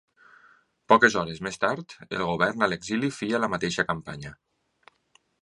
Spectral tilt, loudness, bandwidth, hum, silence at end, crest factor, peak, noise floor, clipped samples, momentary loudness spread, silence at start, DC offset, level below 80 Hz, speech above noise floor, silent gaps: -4.5 dB/octave; -25 LUFS; 11 kHz; none; 1.05 s; 24 dB; -2 dBFS; -66 dBFS; under 0.1%; 16 LU; 0.9 s; under 0.1%; -58 dBFS; 40 dB; none